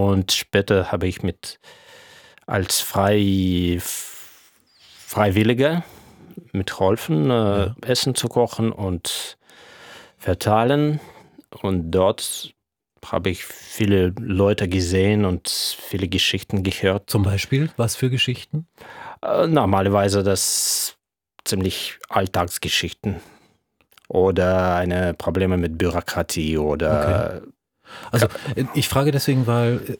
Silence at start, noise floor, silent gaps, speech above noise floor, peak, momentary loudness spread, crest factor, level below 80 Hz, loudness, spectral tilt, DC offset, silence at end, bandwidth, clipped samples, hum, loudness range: 0 s; -62 dBFS; none; 41 dB; -2 dBFS; 11 LU; 20 dB; -48 dBFS; -21 LUFS; -5 dB/octave; under 0.1%; 0.05 s; over 20 kHz; under 0.1%; none; 3 LU